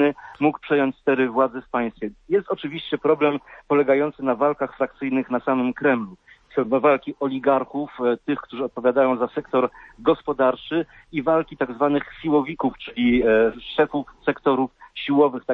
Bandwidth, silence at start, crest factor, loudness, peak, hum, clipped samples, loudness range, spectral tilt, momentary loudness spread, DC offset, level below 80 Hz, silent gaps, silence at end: 4.4 kHz; 0 s; 16 dB; -22 LUFS; -6 dBFS; none; under 0.1%; 1 LU; -8.5 dB/octave; 8 LU; under 0.1%; -54 dBFS; none; 0 s